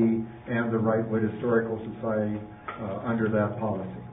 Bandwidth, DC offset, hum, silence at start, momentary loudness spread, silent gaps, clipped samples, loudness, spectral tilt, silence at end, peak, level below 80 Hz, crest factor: 3.8 kHz; under 0.1%; none; 0 s; 9 LU; none; under 0.1%; -28 LUFS; -12 dB/octave; 0 s; -10 dBFS; -56 dBFS; 16 dB